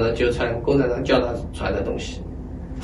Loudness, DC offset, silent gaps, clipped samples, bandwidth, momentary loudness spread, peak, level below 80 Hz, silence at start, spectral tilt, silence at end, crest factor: -22 LUFS; under 0.1%; none; under 0.1%; 11.5 kHz; 14 LU; -4 dBFS; -34 dBFS; 0 s; -6.5 dB/octave; 0 s; 18 dB